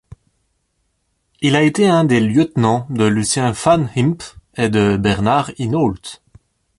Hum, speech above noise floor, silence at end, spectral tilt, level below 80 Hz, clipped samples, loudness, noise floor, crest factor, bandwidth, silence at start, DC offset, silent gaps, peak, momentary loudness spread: none; 52 dB; 0.65 s; -5.5 dB/octave; -44 dBFS; under 0.1%; -16 LUFS; -67 dBFS; 14 dB; 11.5 kHz; 1.4 s; under 0.1%; none; -2 dBFS; 7 LU